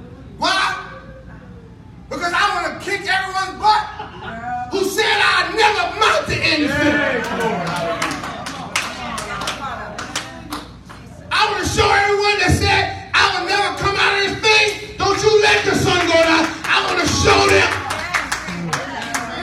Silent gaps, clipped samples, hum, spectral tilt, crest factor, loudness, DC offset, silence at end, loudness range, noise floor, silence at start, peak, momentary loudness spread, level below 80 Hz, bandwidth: none; under 0.1%; none; -3.5 dB/octave; 18 dB; -17 LUFS; under 0.1%; 0 s; 8 LU; -39 dBFS; 0 s; 0 dBFS; 14 LU; -40 dBFS; 16 kHz